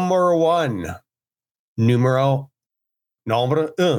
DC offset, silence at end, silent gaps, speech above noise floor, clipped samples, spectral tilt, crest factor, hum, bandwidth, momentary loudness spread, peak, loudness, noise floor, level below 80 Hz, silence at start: under 0.1%; 0 s; 1.51-1.76 s; over 72 dB; under 0.1%; -7 dB/octave; 14 dB; none; 16.5 kHz; 17 LU; -6 dBFS; -19 LUFS; under -90 dBFS; -56 dBFS; 0 s